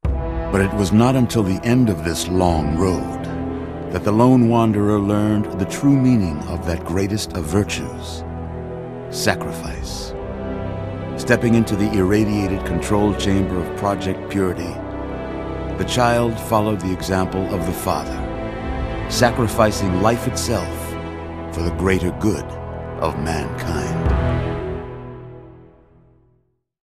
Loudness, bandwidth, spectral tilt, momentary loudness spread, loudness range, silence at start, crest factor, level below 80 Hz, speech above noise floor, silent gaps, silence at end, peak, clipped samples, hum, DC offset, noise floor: -20 LUFS; 15 kHz; -6 dB/octave; 13 LU; 6 LU; 0.05 s; 20 dB; -32 dBFS; 45 dB; none; 1.2 s; 0 dBFS; under 0.1%; none; 0.1%; -64 dBFS